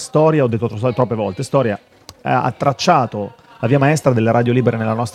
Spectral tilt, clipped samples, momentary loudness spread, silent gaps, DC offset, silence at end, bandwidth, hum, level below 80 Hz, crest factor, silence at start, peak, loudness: -6.5 dB/octave; under 0.1%; 9 LU; none; under 0.1%; 0.05 s; 13.5 kHz; none; -54 dBFS; 16 dB; 0 s; 0 dBFS; -16 LUFS